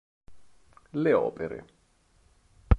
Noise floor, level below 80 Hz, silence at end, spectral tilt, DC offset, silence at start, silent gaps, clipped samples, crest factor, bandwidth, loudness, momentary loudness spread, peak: -65 dBFS; -34 dBFS; 0 s; -9.5 dB/octave; under 0.1%; 0.3 s; none; under 0.1%; 24 dB; 5.6 kHz; -28 LUFS; 13 LU; -6 dBFS